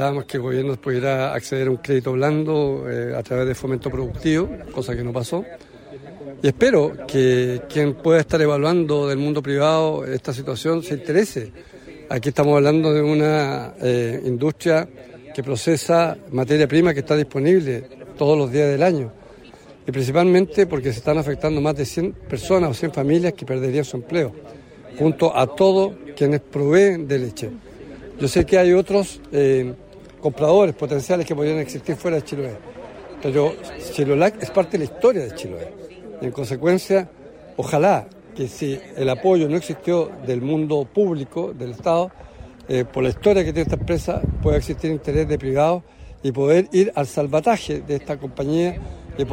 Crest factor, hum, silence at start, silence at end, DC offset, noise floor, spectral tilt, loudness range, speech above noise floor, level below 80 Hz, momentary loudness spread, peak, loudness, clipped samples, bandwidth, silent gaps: 16 dB; none; 0 s; 0 s; under 0.1%; -44 dBFS; -6.5 dB/octave; 4 LU; 25 dB; -42 dBFS; 13 LU; -4 dBFS; -20 LUFS; under 0.1%; 16 kHz; none